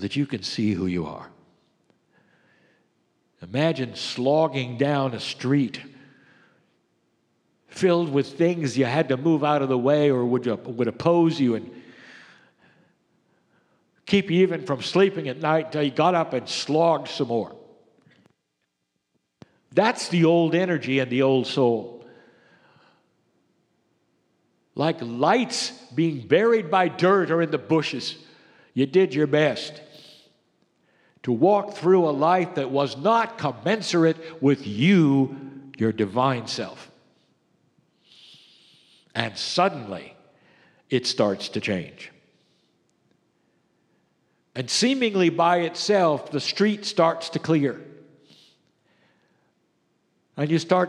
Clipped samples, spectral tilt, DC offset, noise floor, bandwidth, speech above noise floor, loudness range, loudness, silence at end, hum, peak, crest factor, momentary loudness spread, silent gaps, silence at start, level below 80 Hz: under 0.1%; -5.5 dB/octave; under 0.1%; -77 dBFS; 11 kHz; 55 dB; 8 LU; -23 LUFS; 0 s; none; -2 dBFS; 22 dB; 11 LU; none; 0 s; -70 dBFS